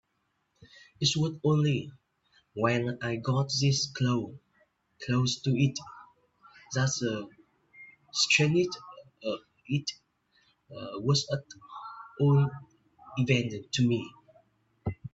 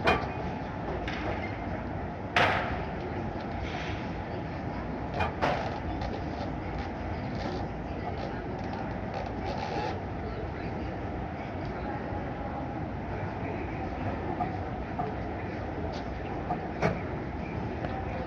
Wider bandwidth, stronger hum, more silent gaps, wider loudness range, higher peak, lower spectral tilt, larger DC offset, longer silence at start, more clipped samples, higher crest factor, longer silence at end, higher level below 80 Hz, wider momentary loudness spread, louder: second, 8 kHz vs 9.2 kHz; neither; neither; about the same, 3 LU vs 4 LU; about the same, -10 dBFS vs -10 dBFS; second, -5 dB/octave vs -7 dB/octave; neither; first, 1 s vs 0 s; neither; about the same, 22 dB vs 24 dB; about the same, 0.05 s vs 0 s; second, -64 dBFS vs -44 dBFS; first, 19 LU vs 6 LU; first, -29 LUFS vs -34 LUFS